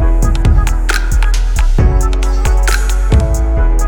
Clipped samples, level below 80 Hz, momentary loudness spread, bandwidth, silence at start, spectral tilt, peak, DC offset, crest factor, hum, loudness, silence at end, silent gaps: under 0.1%; -10 dBFS; 3 LU; 16.5 kHz; 0 s; -5 dB/octave; 0 dBFS; under 0.1%; 10 dB; none; -14 LUFS; 0 s; none